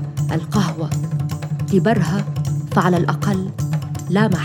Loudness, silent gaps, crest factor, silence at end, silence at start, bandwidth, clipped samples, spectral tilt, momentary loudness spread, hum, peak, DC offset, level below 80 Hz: -20 LUFS; none; 16 dB; 0 s; 0 s; 16.5 kHz; under 0.1%; -7 dB/octave; 7 LU; none; -2 dBFS; under 0.1%; -50 dBFS